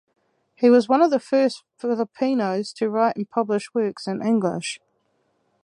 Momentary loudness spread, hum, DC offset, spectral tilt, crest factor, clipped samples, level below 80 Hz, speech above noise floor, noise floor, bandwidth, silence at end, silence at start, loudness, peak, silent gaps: 10 LU; none; under 0.1%; -5.5 dB/octave; 18 dB; under 0.1%; -74 dBFS; 47 dB; -69 dBFS; 11 kHz; 0.9 s; 0.6 s; -22 LUFS; -4 dBFS; none